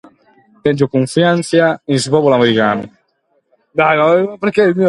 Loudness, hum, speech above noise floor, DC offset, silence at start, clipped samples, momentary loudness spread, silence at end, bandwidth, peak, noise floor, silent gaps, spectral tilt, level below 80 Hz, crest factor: -14 LUFS; none; 50 dB; under 0.1%; 0.65 s; under 0.1%; 7 LU; 0 s; 11.5 kHz; 0 dBFS; -62 dBFS; none; -5.5 dB/octave; -56 dBFS; 14 dB